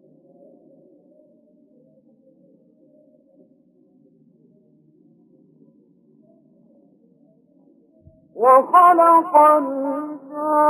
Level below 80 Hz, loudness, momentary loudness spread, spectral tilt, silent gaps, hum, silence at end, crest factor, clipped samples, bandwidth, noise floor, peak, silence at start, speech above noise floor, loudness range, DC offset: -76 dBFS; -15 LUFS; 16 LU; -5.5 dB/octave; none; none; 0 s; 18 dB; under 0.1%; 13 kHz; -57 dBFS; -2 dBFS; 8.35 s; 43 dB; 7 LU; under 0.1%